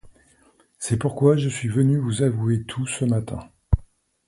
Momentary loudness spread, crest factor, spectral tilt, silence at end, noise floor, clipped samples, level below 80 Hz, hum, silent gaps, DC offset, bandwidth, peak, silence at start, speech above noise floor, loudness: 9 LU; 20 dB; -6.5 dB/octave; 0.45 s; -59 dBFS; under 0.1%; -36 dBFS; none; none; under 0.1%; 11.5 kHz; -4 dBFS; 0.05 s; 37 dB; -23 LUFS